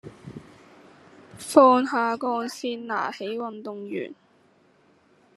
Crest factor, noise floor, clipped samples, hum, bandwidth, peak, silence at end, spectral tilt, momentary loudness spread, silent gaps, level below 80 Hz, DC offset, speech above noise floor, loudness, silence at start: 24 dB; -60 dBFS; under 0.1%; none; 13 kHz; -2 dBFS; 1.25 s; -4.5 dB/octave; 25 LU; none; -72 dBFS; under 0.1%; 37 dB; -23 LUFS; 0.05 s